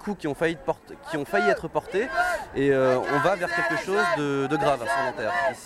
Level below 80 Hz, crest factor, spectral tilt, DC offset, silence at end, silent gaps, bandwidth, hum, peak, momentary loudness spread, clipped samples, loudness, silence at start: -54 dBFS; 16 dB; -5 dB/octave; under 0.1%; 0 s; none; 14.5 kHz; none; -8 dBFS; 8 LU; under 0.1%; -25 LUFS; 0 s